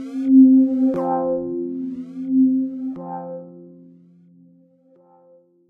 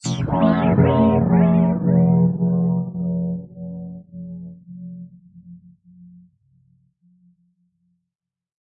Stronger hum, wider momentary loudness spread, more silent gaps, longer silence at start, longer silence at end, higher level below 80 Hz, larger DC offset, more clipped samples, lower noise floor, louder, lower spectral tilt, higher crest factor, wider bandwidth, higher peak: neither; about the same, 19 LU vs 21 LU; neither; about the same, 0 s vs 0.05 s; second, 2 s vs 3.1 s; second, -66 dBFS vs -48 dBFS; neither; neither; second, -54 dBFS vs -86 dBFS; about the same, -18 LUFS vs -18 LUFS; first, -10.5 dB/octave vs -8.5 dB/octave; about the same, 16 dB vs 18 dB; second, 1.8 kHz vs 8 kHz; about the same, -4 dBFS vs -4 dBFS